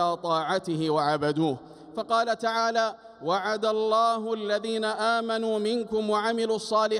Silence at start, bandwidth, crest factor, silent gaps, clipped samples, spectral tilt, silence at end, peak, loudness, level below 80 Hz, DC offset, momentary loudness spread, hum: 0 s; 11.5 kHz; 14 dB; none; under 0.1%; -4.5 dB/octave; 0 s; -12 dBFS; -26 LUFS; -68 dBFS; under 0.1%; 5 LU; none